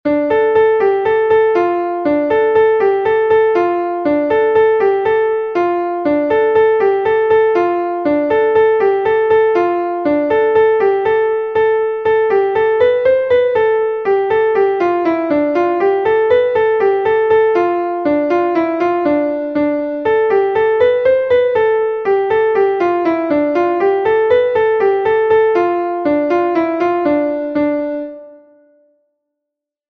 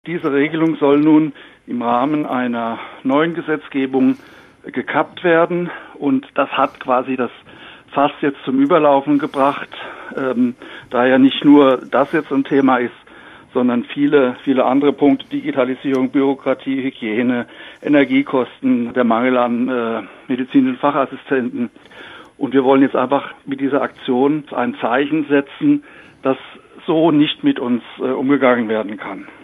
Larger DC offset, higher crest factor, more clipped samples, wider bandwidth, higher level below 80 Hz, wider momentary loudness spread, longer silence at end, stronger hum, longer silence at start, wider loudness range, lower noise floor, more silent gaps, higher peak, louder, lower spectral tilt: neither; about the same, 12 dB vs 16 dB; neither; first, 5.6 kHz vs 4 kHz; first, -52 dBFS vs -64 dBFS; second, 5 LU vs 12 LU; first, 1.55 s vs 0.15 s; neither; about the same, 0.05 s vs 0.05 s; about the same, 2 LU vs 4 LU; first, -81 dBFS vs -41 dBFS; neither; about the same, -2 dBFS vs -2 dBFS; first, -14 LUFS vs -17 LUFS; about the same, -7.5 dB/octave vs -8 dB/octave